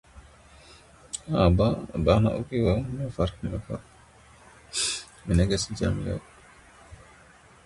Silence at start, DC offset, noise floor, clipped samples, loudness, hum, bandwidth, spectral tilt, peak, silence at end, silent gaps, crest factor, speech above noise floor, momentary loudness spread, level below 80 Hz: 0.15 s; under 0.1%; -54 dBFS; under 0.1%; -26 LUFS; none; 11.5 kHz; -5.5 dB/octave; -6 dBFS; 0.7 s; none; 22 dB; 29 dB; 14 LU; -38 dBFS